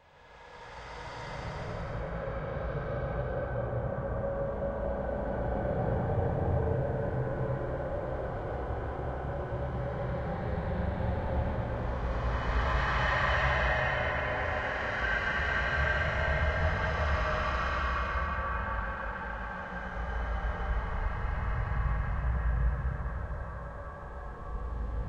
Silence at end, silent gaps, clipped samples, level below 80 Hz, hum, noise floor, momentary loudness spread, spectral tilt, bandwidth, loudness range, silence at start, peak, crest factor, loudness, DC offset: 0 s; none; under 0.1%; -36 dBFS; none; -54 dBFS; 10 LU; -7 dB/octave; 7.8 kHz; 6 LU; 0.25 s; -16 dBFS; 16 dB; -33 LUFS; under 0.1%